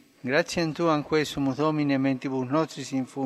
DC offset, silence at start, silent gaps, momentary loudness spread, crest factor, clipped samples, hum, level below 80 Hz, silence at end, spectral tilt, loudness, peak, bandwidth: under 0.1%; 0.25 s; none; 5 LU; 18 dB; under 0.1%; none; -60 dBFS; 0 s; -5.5 dB/octave; -26 LUFS; -8 dBFS; 13 kHz